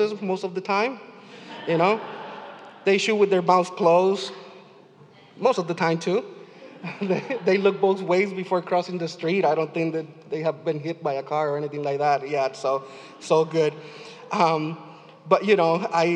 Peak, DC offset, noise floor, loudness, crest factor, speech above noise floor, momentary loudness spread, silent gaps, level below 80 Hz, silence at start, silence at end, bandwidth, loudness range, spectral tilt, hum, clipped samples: -4 dBFS; under 0.1%; -51 dBFS; -23 LUFS; 20 dB; 28 dB; 19 LU; none; -88 dBFS; 0 s; 0 s; 9.8 kHz; 4 LU; -5.5 dB/octave; none; under 0.1%